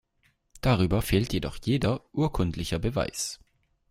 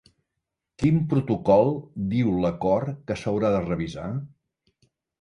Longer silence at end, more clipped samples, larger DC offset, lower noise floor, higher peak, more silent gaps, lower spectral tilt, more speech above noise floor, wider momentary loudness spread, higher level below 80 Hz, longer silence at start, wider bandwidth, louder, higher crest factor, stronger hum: second, 0.55 s vs 0.95 s; neither; neither; second, -70 dBFS vs -83 dBFS; about the same, -8 dBFS vs -6 dBFS; neither; second, -5.5 dB/octave vs -8.5 dB/octave; second, 43 dB vs 60 dB; second, 6 LU vs 11 LU; first, -42 dBFS vs -50 dBFS; second, 0.55 s vs 0.8 s; first, 16 kHz vs 10.5 kHz; second, -28 LUFS vs -24 LUFS; about the same, 18 dB vs 20 dB; neither